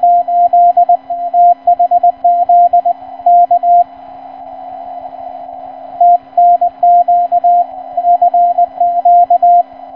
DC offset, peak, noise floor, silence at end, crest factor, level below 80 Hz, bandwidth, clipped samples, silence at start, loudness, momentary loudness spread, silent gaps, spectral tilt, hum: 0.2%; -2 dBFS; -31 dBFS; 0 s; 8 dB; -58 dBFS; 3.1 kHz; under 0.1%; 0 s; -10 LUFS; 19 LU; none; -8 dB/octave; none